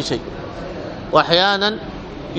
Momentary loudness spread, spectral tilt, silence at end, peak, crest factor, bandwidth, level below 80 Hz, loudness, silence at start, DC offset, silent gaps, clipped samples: 17 LU; -4.5 dB/octave; 0 s; 0 dBFS; 20 dB; 9.4 kHz; -42 dBFS; -17 LUFS; 0 s; under 0.1%; none; under 0.1%